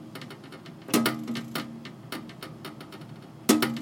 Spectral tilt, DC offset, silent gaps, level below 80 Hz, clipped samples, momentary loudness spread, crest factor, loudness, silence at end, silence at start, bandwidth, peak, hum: -3.5 dB/octave; under 0.1%; none; -70 dBFS; under 0.1%; 19 LU; 26 dB; -29 LUFS; 0 s; 0 s; 17 kHz; -6 dBFS; none